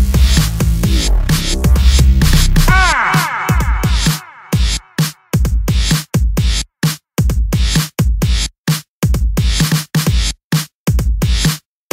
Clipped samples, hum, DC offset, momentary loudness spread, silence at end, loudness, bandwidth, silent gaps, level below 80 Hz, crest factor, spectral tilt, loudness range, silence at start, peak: under 0.1%; none; under 0.1%; 7 LU; 0.35 s; -15 LUFS; 16.5 kHz; 8.58-8.64 s, 8.88-9.02 s, 10.44-10.50 s, 10.74-10.86 s; -16 dBFS; 12 dB; -4.5 dB/octave; 4 LU; 0 s; 0 dBFS